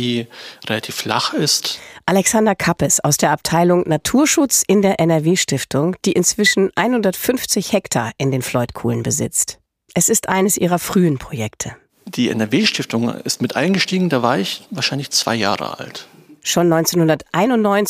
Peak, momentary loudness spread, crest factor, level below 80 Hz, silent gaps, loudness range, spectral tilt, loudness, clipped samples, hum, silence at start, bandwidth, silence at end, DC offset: -2 dBFS; 9 LU; 16 dB; -50 dBFS; none; 4 LU; -4 dB/octave; -17 LUFS; under 0.1%; none; 0 s; 15.5 kHz; 0 s; under 0.1%